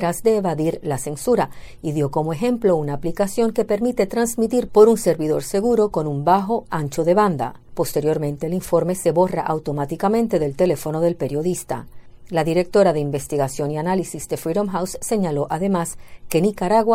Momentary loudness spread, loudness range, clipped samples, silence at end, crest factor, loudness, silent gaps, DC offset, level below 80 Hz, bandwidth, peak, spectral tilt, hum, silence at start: 8 LU; 3 LU; under 0.1%; 0 s; 20 dB; -20 LUFS; none; under 0.1%; -46 dBFS; 16.5 kHz; 0 dBFS; -6 dB/octave; none; 0 s